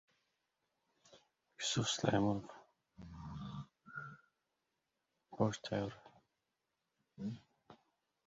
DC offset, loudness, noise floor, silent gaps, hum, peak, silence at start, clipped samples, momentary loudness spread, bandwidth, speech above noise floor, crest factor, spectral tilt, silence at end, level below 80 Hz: under 0.1%; -40 LUFS; -88 dBFS; none; none; -16 dBFS; 1.1 s; under 0.1%; 22 LU; 7.6 kHz; 50 dB; 28 dB; -4.5 dB/octave; 0.5 s; -68 dBFS